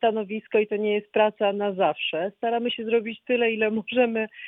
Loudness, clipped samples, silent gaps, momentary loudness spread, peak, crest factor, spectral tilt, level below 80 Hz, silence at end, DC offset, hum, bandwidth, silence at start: -25 LUFS; under 0.1%; none; 4 LU; -8 dBFS; 16 dB; -8 dB/octave; -72 dBFS; 0 s; under 0.1%; none; 4 kHz; 0 s